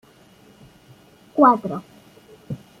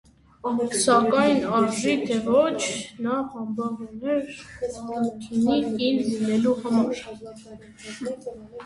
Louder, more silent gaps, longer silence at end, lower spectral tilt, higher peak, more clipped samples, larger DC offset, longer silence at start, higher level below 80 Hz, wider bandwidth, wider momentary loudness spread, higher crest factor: first, -18 LUFS vs -24 LUFS; neither; first, 0.25 s vs 0 s; first, -8 dB/octave vs -4.5 dB/octave; about the same, -4 dBFS vs -6 dBFS; neither; neither; first, 1.35 s vs 0.45 s; second, -64 dBFS vs -58 dBFS; first, 14 kHz vs 11.5 kHz; first, 20 LU vs 16 LU; about the same, 20 dB vs 18 dB